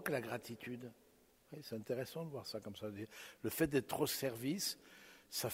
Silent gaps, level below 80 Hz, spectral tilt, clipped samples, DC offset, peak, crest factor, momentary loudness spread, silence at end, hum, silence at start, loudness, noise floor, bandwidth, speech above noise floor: none; -72 dBFS; -4 dB/octave; under 0.1%; under 0.1%; -22 dBFS; 22 dB; 15 LU; 0 s; none; 0 s; -42 LUFS; -67 dBFS; 16 kHz; 25 dB